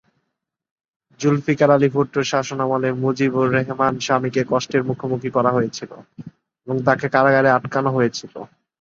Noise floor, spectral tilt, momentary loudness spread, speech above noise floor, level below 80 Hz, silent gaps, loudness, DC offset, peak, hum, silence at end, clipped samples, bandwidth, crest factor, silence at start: -78 dBFS; -6 dB/octave; 11 LU; 59 dB; -60 dBFS; none; -19 LUFS; under 0.1%; -2 dBFS; none; 0.35 s; under 0.1%; 7.6 kHz; 18 dB; 1.2 s